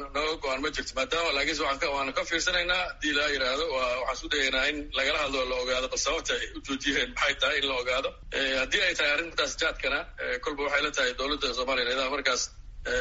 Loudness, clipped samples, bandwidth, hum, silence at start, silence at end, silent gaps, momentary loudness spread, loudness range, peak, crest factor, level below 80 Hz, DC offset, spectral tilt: -27 LUFS; under 0.1%; 8 kHz; none; 0 s; 0 s; none; 6 LU; 1 LU; -10 dBFS; 18 dB; -46 dBFS; under 0.1%; 0.5 dB/octave